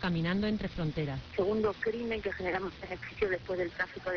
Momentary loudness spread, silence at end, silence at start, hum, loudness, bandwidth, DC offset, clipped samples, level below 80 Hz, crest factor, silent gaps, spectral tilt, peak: 6 LU; 0 s; 0 s; none; -34 LUFS; 5.4 kHz; under 0.1%; under 0.1%; -52 dBFS; 14 dB; none; -7.5 dB/octave; -18 dBFS